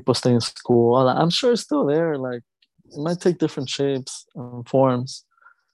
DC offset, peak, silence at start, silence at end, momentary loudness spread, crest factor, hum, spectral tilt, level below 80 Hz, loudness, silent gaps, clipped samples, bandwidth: under 0.1%; -4 dBFS; 0.05 s; 0.55 s; 17 LU; 18 dB; none; -6 dB/octave; -62 dBFS; -21 LUFS; none; under 0.1%; 12 kHz